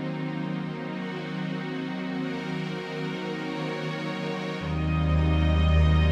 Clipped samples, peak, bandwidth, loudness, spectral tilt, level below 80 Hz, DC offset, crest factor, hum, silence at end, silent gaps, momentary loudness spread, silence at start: under 0.1%; -12 dBFS; 7.8 kHz; -28 LUFS; -7.5 dB/octave; -32 dBFS; under 0.1%; 14 dB; none; 0 s; none; 10 LU; 0 s